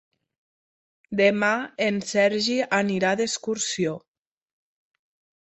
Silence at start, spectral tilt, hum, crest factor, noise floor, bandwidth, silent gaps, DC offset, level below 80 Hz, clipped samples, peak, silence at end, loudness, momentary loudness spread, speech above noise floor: 1.1 s; -3.5 dB/octave; none; 20 dB; under -90 dBFS; 8.4 kHz; none; under 0.1%; -68 dBFS; under 0.1%; -6 dBFS; 1.5 s; -23 LUFS; 7 LU; over 67 dB